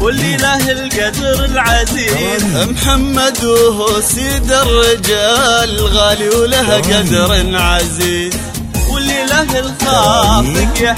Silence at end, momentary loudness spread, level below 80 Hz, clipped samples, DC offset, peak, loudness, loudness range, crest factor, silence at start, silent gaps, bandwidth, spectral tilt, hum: 0 s; 5 LU; -20 dBFS; under 0.1%; under 0.1%; 0 dBFS; -11 LUFS; 2 LU; 12 dB; 0 s; none; 16.5 kHz; -3.5 dB/octave; none